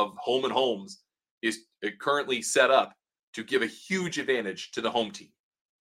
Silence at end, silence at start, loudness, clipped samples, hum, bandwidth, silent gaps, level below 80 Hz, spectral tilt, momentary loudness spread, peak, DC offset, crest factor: 0.6 s; 0 s; -28 LUFS; under 0.1%; none; 16 kHz; 1.31-1.41 s, 3.19-3.33 s; -78 dBFS; -3 dB/octave; 14 LU; -6 dBFS; under 0.1%; 22 dB